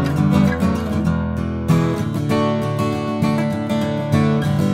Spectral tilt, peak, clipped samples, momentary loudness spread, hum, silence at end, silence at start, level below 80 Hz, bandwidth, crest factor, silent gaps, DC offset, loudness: -7.5 dB/octave; -4 dBFS; under 0.1%; 5 LU; none; 0 s; 0 s; -40 dBFS; 16 kHz; 14 dB; none; under 0.1%; -19 LUFS